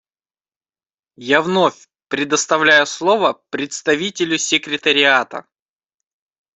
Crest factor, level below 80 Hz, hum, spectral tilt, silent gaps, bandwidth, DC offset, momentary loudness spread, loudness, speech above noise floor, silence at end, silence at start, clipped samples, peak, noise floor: 18 dB; -64 dBFS; none; -2.5 dB/octave; none; 8.4 kHz; under 0.1%; 13 LU; -16 LUFS; over 73 dB; 1.15 s; 1.2 s; under 0.1%; 0 dBFS; under -90 dBFS